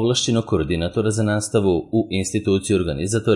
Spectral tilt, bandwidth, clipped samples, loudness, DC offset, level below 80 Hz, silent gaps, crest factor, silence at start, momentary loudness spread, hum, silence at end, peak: -5 dB/octave; 11.5 kHz; under 0.1%; -20 LUFS; under 0.1%; -44 dBFS; none; 14 dB; 0 s; 3 LU; none; 0 s; -6 dBFS